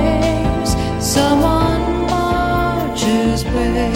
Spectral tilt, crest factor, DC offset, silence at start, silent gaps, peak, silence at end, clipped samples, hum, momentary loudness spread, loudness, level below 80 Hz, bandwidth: -5.5 dB/octave; 14 dB; under 0.1%; 0 s; none; -2 dBFS; 0 s; under 0.1%; none; 4 LU; -16 LUFS; -24 dBFS; 16.5 kHz